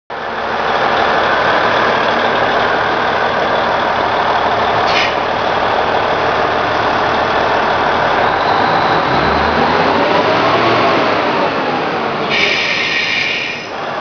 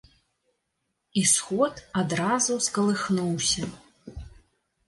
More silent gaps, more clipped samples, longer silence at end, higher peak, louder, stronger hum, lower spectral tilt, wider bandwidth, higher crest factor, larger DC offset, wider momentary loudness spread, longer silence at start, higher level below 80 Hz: neither; neither; second, 0 s vs 0.6 s; first, 0 dBFS vs -8 dBFS; first, -13 LUFS vs -25 LUFS; neither; about the same, -4.5 dB/octave vs -3.5 dB/octave; second, 5.4 kHz vs 12 kHz; second, 14 dB vs 20 dB; neither; second, 4 LU vs 21 LU; second, 0.1 s vs 1.15 s; first, -40 dBFS vs -54 dBFS